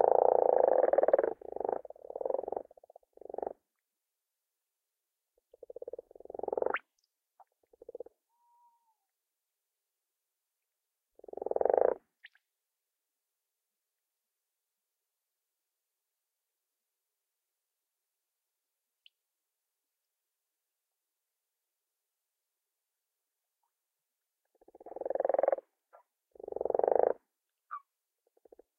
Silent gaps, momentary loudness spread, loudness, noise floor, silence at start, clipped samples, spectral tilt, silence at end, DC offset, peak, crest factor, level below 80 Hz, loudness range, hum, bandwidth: none; 23 LU; -32 LUFS; -89 dBFS; 0 s; under 0.1%; -7 dB/octave; 1 s; under 0.1%; -10 dBFS; 28 dB; -80 dBFS; 14 LU; none; 3.5 kHz